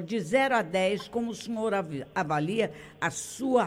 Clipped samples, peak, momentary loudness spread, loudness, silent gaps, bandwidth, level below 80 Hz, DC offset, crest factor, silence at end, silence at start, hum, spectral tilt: under 0.1%; -10 dBFS; 8 LU; -29 LUFS; none; 16.5 kHz; -64 dBFS; under 0.1%; 18 dB; 0 s; 0 s; none; -4.5 dB/octave